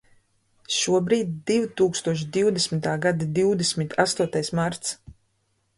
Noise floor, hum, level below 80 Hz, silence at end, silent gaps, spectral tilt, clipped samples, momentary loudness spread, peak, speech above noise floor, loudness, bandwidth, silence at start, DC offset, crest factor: -70 dBFS; none; -60 dBFS; 0.65 s; none; -4.5 dB/octave; under 0.1%; 5 LU; -4 dBFS; 47 dB; -24 LUFS; 11.5 kHz; 0.7 s; under 0.1%; 20 dB